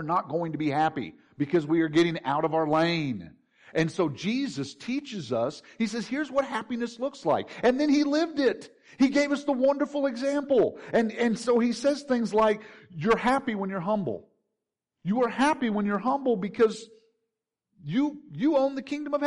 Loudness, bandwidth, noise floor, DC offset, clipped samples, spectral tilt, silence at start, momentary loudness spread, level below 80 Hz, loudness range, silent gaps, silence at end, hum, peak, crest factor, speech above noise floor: -27 LUFS; 11 kHz; -85 dBFS; under 0.1%; under 0.1%; -6 dB/octave; 0 s; 9 LU; -62 dBFS; 4 LU; none; 0 s; none; -12 dBFS; 14 dB; 59 dB